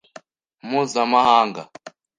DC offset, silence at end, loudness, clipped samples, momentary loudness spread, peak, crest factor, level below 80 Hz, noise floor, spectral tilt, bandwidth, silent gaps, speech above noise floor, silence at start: under 0.1%; 0.3 s; -18 LUFS; under 0.1%; 23 LU; -2 dBFS; 20 dB; -66 dBFS; -47 dBFS; -4 dB/octave; 10 kHz; none; 29 dB; 0.65 s